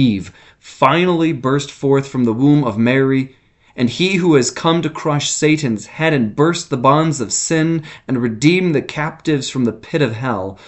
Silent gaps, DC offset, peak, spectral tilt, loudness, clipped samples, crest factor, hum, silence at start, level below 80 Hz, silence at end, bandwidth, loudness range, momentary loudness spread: none; under 0.1%; 0 dBFS; -5 dB/octave; -16 LUFS; under 0.1%; 16 dB; none; 0 s; -52 dBFS; 0.1 s; 8.4 kHz; 1 LU; 8 LU